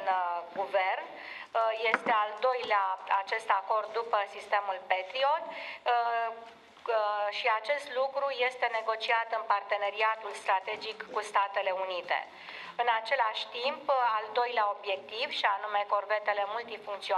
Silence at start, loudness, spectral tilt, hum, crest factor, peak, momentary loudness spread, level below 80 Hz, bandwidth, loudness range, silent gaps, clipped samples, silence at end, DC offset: 0 s; -31 LUFS; -1.5 dB/octave; none; 24 dB; -8 dBFS; 7 LU; -86 dBFS; 12 kHz; 2 LU; none; under 0.1%; 0 s; under 0.1%